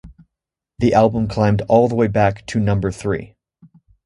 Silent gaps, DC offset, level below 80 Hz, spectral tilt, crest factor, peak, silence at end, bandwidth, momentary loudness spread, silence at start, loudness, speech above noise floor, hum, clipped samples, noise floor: none; under 0.1%; -40 dBFS; -7.5 dB/octave; 18 dB; 0 dBFS; 0.8 s; 11 kHz; 8 LU; 0.05 s; -18 LUFS; 68 dB; none; under 0.1%; -84 dBFS